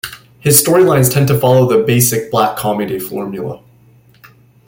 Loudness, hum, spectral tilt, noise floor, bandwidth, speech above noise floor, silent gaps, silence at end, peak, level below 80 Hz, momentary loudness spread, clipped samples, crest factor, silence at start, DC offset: -12 LUFS; none; -5 dB/octave; -47 dBFS; 17 kHz; 35 dB; none; 1.1 s; 0 dBFS; -48 dBFS; 15 LU; under 0.1%; 14 dB; 0.05 s; under 0.1%